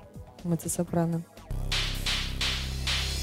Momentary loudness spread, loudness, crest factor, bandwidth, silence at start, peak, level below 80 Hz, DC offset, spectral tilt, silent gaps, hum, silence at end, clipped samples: 10 LU; -30 LUFS; 16 dB; 16 kHz; 0 s; -14 dBFS; -36 dBFS; under 0.1%; -3.5 dB/octave; none; none; 0 s; under 0.1%